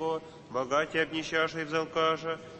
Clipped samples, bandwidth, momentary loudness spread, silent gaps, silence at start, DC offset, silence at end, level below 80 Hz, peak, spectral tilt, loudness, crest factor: under 0.1%; 8.6 kHz; 7 LU; none; 0 s; under 0.1%; 0 s; -64 dBFS; -14 dBFS; -4 dB/octave; -30 LUFS; 18 dB